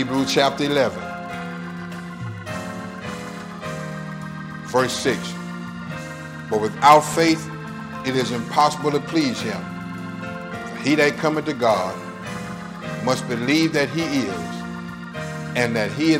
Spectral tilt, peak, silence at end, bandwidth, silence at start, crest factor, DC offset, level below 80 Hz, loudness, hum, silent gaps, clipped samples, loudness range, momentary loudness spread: -5 dB/octave; 0 dBFS; 0 s; 16 kHz; 0 s; 22 dB; under 0.1%; -54 dBFS; -23 LUFS; none; none; under 0.1%; 8 LU; 14 LU